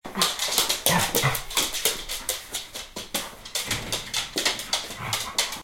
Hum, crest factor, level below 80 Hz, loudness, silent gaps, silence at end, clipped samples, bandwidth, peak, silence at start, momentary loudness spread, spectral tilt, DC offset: none; 26 dB; -48 dBFS; -25 LUFS; none; 0 s; under 0.1%; 17 kHz; 0 dBFS; 0.05 s; 10 LU; -1.5 dB/octave; under 0.1%